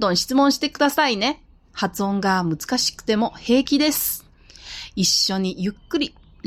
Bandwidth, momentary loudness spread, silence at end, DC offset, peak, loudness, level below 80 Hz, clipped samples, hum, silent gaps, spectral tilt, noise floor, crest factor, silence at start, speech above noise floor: 16.5 kHz; 11 LU; 0.4 s; under 0.1%; -6 dBFS; -21 LUFS; -50 dBFS; under 0.1%; none; none; -3.5 dB/octave; -43 dBFS; 16 dB; 0 s; 22 dB